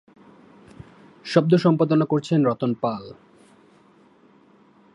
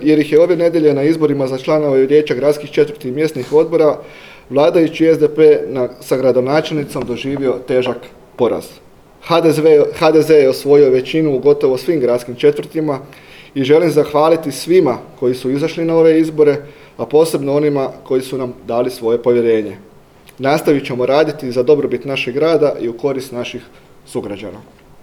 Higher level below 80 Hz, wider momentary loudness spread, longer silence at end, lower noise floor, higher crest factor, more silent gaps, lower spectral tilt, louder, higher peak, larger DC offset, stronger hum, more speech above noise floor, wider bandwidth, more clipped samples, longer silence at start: second, -66 dBFS vs -52 dBFS; first, 16 LU vs 11 LU; first, 1.85 s vs 0.4 s; first, -55 dBFS vs -43 dBFS; first, 22 dB vs 14 dB; neither; first, -8 dB/octave vs -6.5 dB/octave; second, -21 LUFS vs -14 LUFS; about the same, -2 dBFS vs 0 dBFS; neither; neither; first, 35 dB vs 30 dB; second, 10.5 kHz vs 15.5 kHz; neither; first, 1.25 s vs 0 s